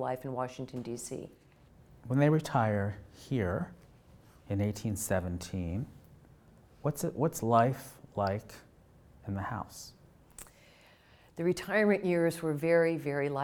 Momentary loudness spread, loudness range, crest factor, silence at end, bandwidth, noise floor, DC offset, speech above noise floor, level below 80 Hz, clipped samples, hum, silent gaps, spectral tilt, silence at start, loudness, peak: 21 LU; 8 LU; 22 dB; 0 s; 20 kHz; -60 dBFS; under 0.1%; 29 dB; -60 dBFS; under 0.1%; none; none; -6.5 dB/octave; 0 s; -32 LUFS; -12 dBFS